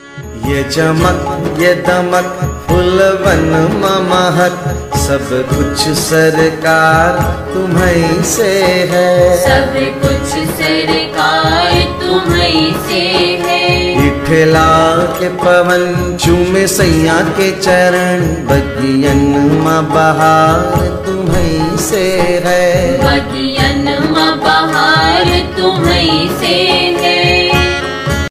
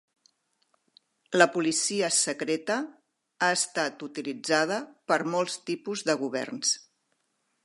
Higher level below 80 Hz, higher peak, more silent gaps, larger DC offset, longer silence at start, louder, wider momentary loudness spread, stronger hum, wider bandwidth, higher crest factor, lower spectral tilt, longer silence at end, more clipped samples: first, -26 dBFS vs -82 dBFS; first, 0 dBFS vs -4 dBFS; neither; neither; second, 0 s vs 1.3 s; first, -11 LUFS vs -27 LUFS; second, 6 LU vs 10 LU; neither; first, 16 kHz vs 11.5 kHz; second, 10 dB vs 26 dB; first, -4.5 dB/octave vs -2 dB/octave; second, 0 s vs 0.85 s; neither